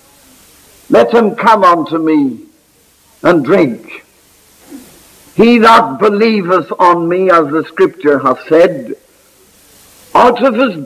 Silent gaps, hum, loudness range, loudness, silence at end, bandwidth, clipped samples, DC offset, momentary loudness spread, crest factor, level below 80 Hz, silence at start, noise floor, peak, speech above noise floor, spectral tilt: none; none; 5 LU; -10 LUFS; 0 s; 15.5 kHz; 0.2%; under 0.1%; 10 LU; 12 dB; -52 dBFS; 0.9 s; -49 dBFS; 0 dBFS; 40 dB; -6 dB/octave